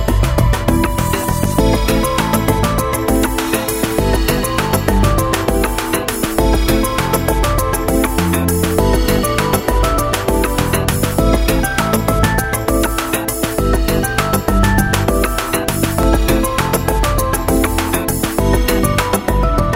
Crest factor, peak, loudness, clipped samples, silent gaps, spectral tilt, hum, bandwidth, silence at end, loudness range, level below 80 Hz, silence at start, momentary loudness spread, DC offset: 14 dB; 0 dBFS; -15 LUFS; under 0.1%; none; -5 dB/octave; none; 16.5 kHz; 0 s; 1 LU; -20 dBFS; 0 s; 3 LU; under 0.1%